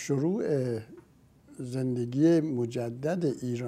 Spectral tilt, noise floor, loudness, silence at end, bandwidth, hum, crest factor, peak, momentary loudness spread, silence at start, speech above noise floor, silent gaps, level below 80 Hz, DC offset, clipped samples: -7.5 dB/octave; -57 dBFS; -29 LUFS; 0 s; 13.5 kHz; none; 16 dB; -14 dBFS; 11 LU; 0 s; 29 dB; none; -68 dBFS; under 0.1%; under 0.1%